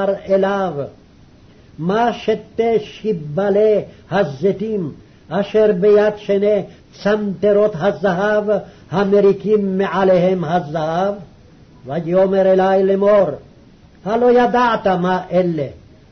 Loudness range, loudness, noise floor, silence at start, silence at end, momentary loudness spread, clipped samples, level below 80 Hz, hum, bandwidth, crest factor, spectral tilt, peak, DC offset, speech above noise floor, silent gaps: 4 LU; -16 LUFS; -45 dBFS; 0 s; 0.35 s; 10 LU; under 0.1%; -50 dBFS; none; 6.4 kHz; 12 dB; -7.5 dB/octave; -6 dBFS; under 0.1%; 30 dB; none